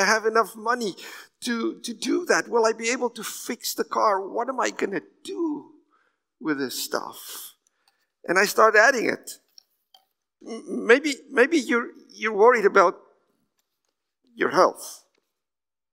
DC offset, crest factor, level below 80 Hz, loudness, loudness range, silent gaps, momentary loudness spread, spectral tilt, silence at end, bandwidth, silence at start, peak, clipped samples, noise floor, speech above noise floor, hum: under 0.1%; 22 dB; -86 dBFS; -23 LUFS; 8 LU; none; 19 LU; -2.5 dB/octave; 0.95 s; 16 kHz; 0 s; -2 dBFS; under 0.1%; under -90 dBFS; over 67 dB; none